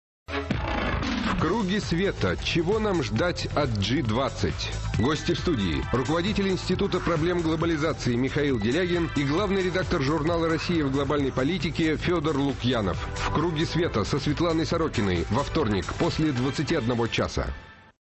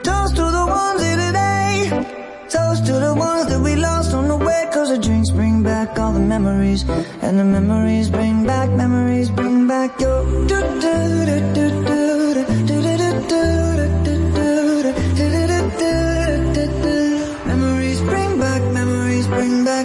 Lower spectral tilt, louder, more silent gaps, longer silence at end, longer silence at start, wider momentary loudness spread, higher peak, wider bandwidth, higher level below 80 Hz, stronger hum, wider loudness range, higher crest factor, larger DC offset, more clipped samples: about the same, -6 dB/octave vs -6 dB/octave; second, -26 LUFS vs -17 LUFS; neither; first, 0.3 s vs 0 s; first, 0.3 s vs 0 s; about the same, 3 LU vs 3 LU; second, -14 dBFS vs -6 dBFS; second, 8.4 kHz vs 11.5 kHz; second, -38 dBFS vs -28 dBFS; neither; about the same, 1 LU vs 1 LU; about the same, 12 dB vs 10 dB; neither; neither